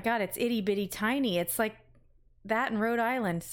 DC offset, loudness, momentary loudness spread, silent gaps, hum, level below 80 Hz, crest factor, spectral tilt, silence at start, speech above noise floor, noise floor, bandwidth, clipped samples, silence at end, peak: under 0.1%; -30 LUFS; 3 LU; none; none; -62 dBFS; 16 dB; -4.5 dB/octave; 0 s; 31 dB; -61 dBFS; 17 kHz; under 0.1%; 0 s; -14 dBFS